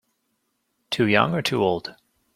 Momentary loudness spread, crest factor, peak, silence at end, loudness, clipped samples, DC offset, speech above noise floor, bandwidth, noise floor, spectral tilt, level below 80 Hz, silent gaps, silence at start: 11 LU; 24 dB; -2 dBFS; 0.45 s; -22 LUFS; under 0.1%; under 0.1%; 52 dB; 15.5 kHz; -73 dBFS; -5.5 dB/octave; -62 dBFS; none; 0.9 s